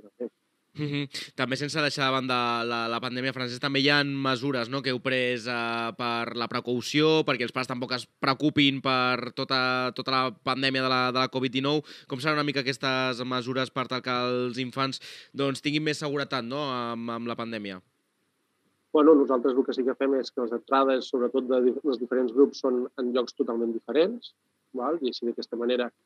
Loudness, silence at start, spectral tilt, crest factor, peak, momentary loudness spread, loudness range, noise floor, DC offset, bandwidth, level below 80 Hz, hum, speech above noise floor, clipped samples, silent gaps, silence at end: -27 LUFS; 0.05 s; -5 dB/octave; 22 dB; -6 dBFS; 9 LU; 4 LU; -74 dBFS; under 0.1%; 13 kHz; -80 dBFS; none; 47 dB; under 0.1%; none; 0.15 s